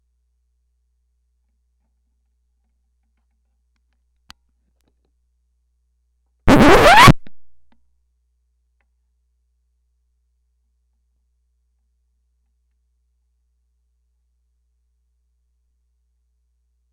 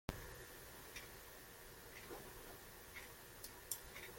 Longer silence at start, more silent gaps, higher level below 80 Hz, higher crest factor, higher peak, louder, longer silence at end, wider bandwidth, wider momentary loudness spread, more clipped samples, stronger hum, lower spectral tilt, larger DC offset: first, 6.45 s vs 0.1 s; neither; first, -34 dBFS vs -64 dBFS; second, 22 dB vs 32 dB; first, 0 dBFS vs -22 dBFS; first, -10 LUFS vs -53 LUFS; first, 9.5 s vs 0 s; second, 10.5 kHz vs 17 kHz; first, 13 LU vs 8 LU; neither; first, 60 Hz at -55 dBFS vs none; first, -5 dB/octave vs -2.5 dB/octave; neither